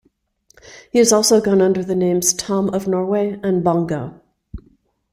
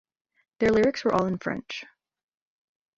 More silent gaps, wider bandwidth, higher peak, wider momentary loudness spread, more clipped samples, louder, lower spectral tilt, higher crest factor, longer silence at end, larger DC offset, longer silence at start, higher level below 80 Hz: neither; first, 16 kHz vs 7.8 kHz; first, -2 dBFS vs -8 dBFS; second, 7 LU vs 14 LU; neither; first, -17 LUFS vs -25 LUFS; second, -4.5 dB/octave vs -6 dB/octave; about the same, 16 dB vs 20 dB; second, 0.55 s vs 1.15 s; neither; about the same, 0.65 s vs 0.6 s; first, -48 dBFS vs -56 dBFS